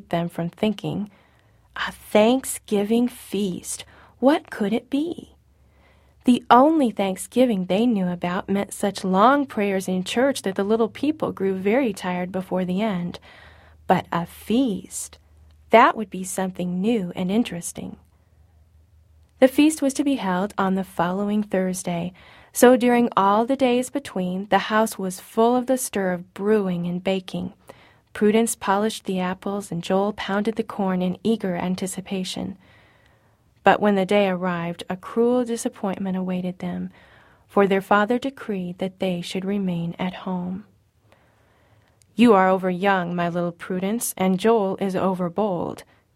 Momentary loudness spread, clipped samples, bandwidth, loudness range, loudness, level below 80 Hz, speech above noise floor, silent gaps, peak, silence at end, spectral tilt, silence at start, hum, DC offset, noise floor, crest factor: 12 LU; under 0.1%; 16 kHz; 5 LU; -22 LUFS; -58 dBFS; 38 dB; none; 0 dBFS; 0.3 s; -5.5 dB/octave; 0.1 s; none; under 0.1%; -59 dBFS; 22 dB